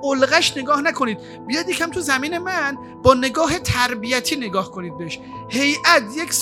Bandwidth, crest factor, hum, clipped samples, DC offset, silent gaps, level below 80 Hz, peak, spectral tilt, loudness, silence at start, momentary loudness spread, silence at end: 18 kHz; 20 dB; none; under 0.1%; under 0.1%; none; -46 dBFS; 0 dBFS; -3 dB/octave; -19 LUFS; 0 s; 14 LU; 0 s